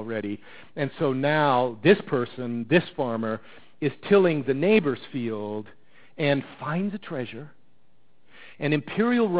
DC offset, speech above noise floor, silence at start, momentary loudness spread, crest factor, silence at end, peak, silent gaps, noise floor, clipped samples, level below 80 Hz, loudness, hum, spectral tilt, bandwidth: 0.5%; 43 dB; 0 s; 13 LU; 20 dB; 0 s; -4 dBFS; none; -67 dBFS; under 0.1%; -64 dBFS; -25 LUFS; none; -10.5 dB/octave; 4 kHz